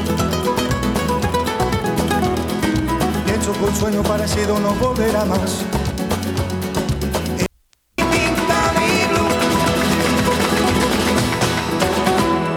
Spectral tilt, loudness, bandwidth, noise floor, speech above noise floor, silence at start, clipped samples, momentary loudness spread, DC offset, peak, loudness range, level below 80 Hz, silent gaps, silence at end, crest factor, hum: -4.5 dB/octave; -18 LUFS; 19.5 kHz; -58 dBFS; 40 dB; 0 s; under 0.1%; 5 LU; under 0.1%; -2 dBFS; 4 LU; -32 dBFS; none; 0 s; 16 dB; none